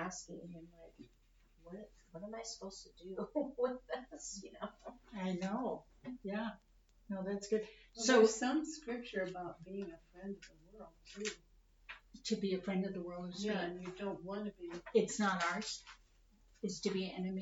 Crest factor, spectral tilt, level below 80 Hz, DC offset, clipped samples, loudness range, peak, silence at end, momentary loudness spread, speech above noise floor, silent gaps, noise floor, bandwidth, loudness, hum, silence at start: 24 dB; -4.5 dB/octave; -68 dBFS; under 0.1%; under 0.1%; 10 LU; -16 dBFS; 0 s; 19 LU; 28 dB; none; -68 dBFS; 8 kHz; -39 LUFS; none; 0 s